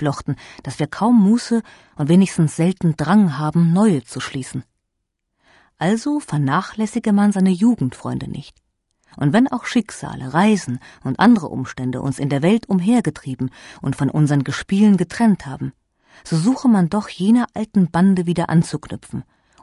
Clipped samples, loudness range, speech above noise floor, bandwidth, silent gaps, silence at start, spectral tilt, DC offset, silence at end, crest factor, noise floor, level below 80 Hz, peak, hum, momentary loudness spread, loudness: under 0.1%; 3 LU; 58 dB; 11.5 kHz; none; 0 s; -7 dB/octave; under 0.1%; 0.4 s; 16 dB; -76 dBFS; -52 dBFS; -2 dBFS; none; 13 LU; -18 LUFS